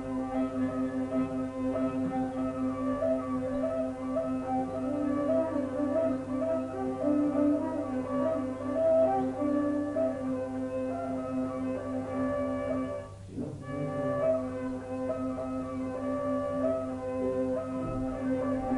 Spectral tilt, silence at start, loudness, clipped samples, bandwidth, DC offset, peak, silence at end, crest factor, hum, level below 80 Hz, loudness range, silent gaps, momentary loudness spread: -8 dB/octave; 0 s; -31 LUFS; under 0.1%; 11 kHz; under 0.1%; -16 dBFS; 0 s; 14 dB; 50 Hz at -50 dBFS; -54 dBFS; 4 LU; none; 6 LU